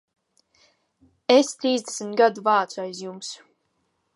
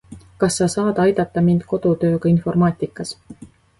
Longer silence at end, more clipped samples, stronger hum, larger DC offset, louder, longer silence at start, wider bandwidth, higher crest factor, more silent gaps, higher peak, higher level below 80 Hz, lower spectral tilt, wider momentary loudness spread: first, 0.8 s vs 0.35 s; neither; neither; neither; second, -22 LUFS vs -18 LUFS; first, 1.3 s vs 0.1 s; about the same, 11.5 kHz vs 11.5 kHz; first, 22 dB vs 14 dB; neither; about the same, -2 dBFS vs -4 dBFS; second, -80 dBFS vs -48 dBFS; second, -3 dB/octave vs -6.5 dB/octave; first, 16 LU vs 10 LU